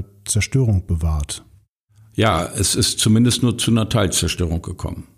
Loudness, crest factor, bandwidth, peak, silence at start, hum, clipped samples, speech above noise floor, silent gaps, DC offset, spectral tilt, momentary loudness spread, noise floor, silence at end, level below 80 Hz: -18 LUFS; 14 dB; 15.5 kHz; -4 dBFS; 0 s; none; under 0.1%; 35 dB; 1.69-1.88 s; under 0.1%; -4.5 dB/octave; 13 LU; -54 dBFS; 0.15 s; -32 dBFS